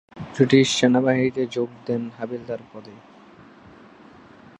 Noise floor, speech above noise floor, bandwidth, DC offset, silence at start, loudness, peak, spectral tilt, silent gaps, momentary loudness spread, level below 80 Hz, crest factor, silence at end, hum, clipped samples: -48 dBFS; 27 dB; 10.5 kHz; under 0.1%; 0.15 s; -21 LUFS; -2 dBFS; -5 dB/octave; none; 18 LU; -62 dBFS; 20 dB; 1.65 s; none; under 0.1%